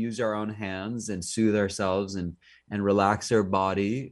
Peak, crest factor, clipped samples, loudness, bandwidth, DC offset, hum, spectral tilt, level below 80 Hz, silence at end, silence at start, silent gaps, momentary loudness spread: -8 dBFS; 18 dB; under 0.1%; -27 LUFS; 11.5 kHz; under 0.1%; none; -5.5 dB/octave; -60 dBFS; 0 s; 0 s; none; 10 LU